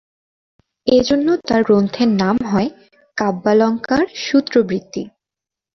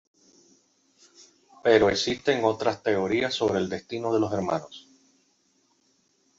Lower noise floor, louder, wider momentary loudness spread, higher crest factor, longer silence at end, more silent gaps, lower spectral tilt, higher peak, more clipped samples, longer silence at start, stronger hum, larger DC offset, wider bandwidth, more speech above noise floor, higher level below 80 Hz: first, -87 dBFS vs -68 dBFS; first, -17 LUFS vs -25 LUFS; about the same, 11 LU vs 11 LU; second, 16 dB vs 22 dB; second, 0.7 s vs 1.6 s; neither; first, -6 dB/octave vs -4.5 dB/octave; first, -2 dBFS vs -6 dBFS; neither; second, 0.85 s vs 1.65 s; neither; neither; second, 6.4 kHz vs 7.8 kHz; first, 71 dB vs 43 dB; first, -50 dBFS vs -58 dBFS